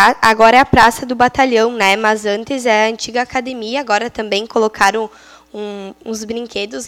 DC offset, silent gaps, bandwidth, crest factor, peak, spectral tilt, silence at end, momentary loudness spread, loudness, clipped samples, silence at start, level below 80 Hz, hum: under 0.1%; none; 18.5 kHz; 14 dB; 0 dBFS; -3.5 dB/octave; 0 s; 17 LU; -14 LUFS; 0.3%; 0 s; -42 dBFS; none